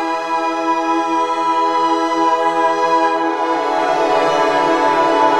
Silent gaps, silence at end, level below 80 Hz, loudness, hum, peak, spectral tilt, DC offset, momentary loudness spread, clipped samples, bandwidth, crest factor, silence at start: none; 0 s; -56 dBFS; -16 LUFS; none; -2 dBFS; -3.5 dB/octave; under 0.1%; 4 LU; under 0.1%; 12 kHz; 14 dB; 0 s